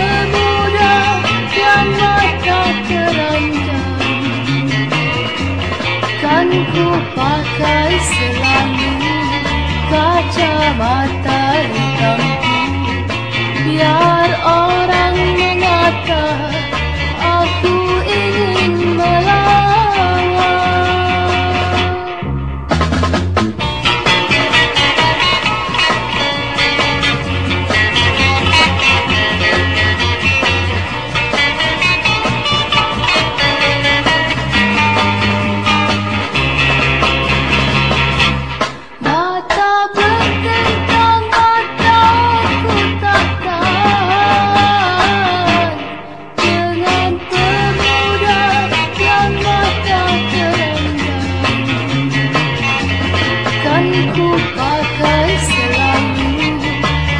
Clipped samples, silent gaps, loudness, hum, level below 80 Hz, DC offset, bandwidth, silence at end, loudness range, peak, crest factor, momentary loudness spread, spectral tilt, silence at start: under 0.1%; none; -13 LUFS; none; -30 dBFS; 1%; 10.5 kHz; 0 s; 3 LU; 0 dBFS; 14 dB; 5 LU; -5 dB/octave; 0 s